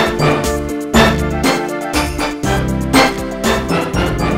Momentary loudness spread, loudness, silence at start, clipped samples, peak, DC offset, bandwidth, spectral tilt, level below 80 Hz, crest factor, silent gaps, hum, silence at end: 7 LU; -15 LUFS; 0 s; under 0.1%; 0 dBFS; 0.5%; 16.5 kHz; -5 dB/octave; -26 dBFS; 14 dB; none; none; 0 s